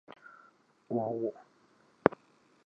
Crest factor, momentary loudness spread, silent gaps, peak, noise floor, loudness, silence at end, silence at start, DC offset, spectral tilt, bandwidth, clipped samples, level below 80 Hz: 34 dB; 24 LU; none; -4 dBFS; -66 dBFS; -33 LUFS; 0.5 s; 0.1 s; under 0.1%; -9 dB/octave; 7.4 kHz; under 0.1%; -72 dBFS